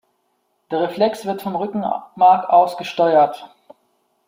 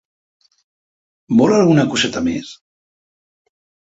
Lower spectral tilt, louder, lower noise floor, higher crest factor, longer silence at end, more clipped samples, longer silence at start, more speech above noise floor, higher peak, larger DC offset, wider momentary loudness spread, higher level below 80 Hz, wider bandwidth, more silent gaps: about the same, -6 dB/octave vs -5.5 dB/octave; second, -18 LUFS vs -15 LUFS; second, -68 dBFS vs under -90 dBFS; about the same, 16 dB vs 18 dB; second, 0.8 s vs 1.4 s; neither; second, 0.7 s vs 1.3 s; second, 51 dB vs over 76 dB; about the same, -2 dBFS vs -2 dBFS; neither; about the same, 11 LU vs 13 LU; second, -68 dBFS vs -52 dBFS; first, 16 kHz vs 8 kHz; neither